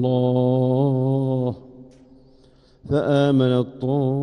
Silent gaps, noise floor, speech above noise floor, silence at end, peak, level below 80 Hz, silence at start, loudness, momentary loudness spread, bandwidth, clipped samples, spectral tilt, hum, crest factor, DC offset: none; -53 dBFS; 34 dB; 0 s; -8 dBFS; -54 dBFS; 0 s; -20 LUFS; 7 LU; 9.4 kHz; under 0.1%; -9.5 dB/octave; none; 14 dB; under 0.1%